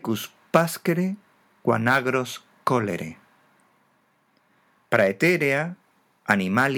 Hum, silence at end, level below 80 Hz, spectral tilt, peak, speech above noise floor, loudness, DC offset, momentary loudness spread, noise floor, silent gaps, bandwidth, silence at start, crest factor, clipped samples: none; 0 s; -72 dBFS; -5.5 dB/octave; -2 dBFS; 43 dB; -23 LUFS; under 0.1%; 13 LU; -65 dBFS; none; 19.5 kHz; 0.05 s; 24 dB; under 0.1%